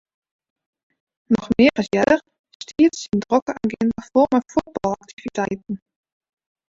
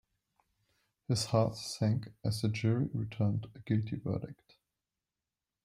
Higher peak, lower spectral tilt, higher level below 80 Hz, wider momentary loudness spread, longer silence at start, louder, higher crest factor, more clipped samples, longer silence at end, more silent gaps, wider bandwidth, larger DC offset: first, -2 dBFS vs -14 dBFS; about the same, -5.5 dB/octave vs -6.5 dB/octave; first, -54 dBFS vs -64 dBFS; first, 14 LU vs 8 LU; first, 1.3 s vs 1.1 s; first, -20 LUFS vs -34 LUFS; about the same, 20 dB vs 20 dB; neither; second, 0.95 s vs 1.3 s; first, 2.39-2.44 s, 2.55-2.60 s, 3.42-3.46 s, 5.13-5.17 s vs none; second, 7.8 kHz vs 13.5 kHz; neither